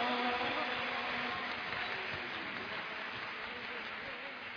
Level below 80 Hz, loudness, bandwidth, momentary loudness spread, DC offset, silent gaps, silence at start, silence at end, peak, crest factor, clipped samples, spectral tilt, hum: -70 dBFS; -38 LUFS; 5.4 kHz; 7 LU; under 0.1%; none; 0 s; 0 s; -22 dBFS; 16 dB; under 0.1%; -4 dB/octave; none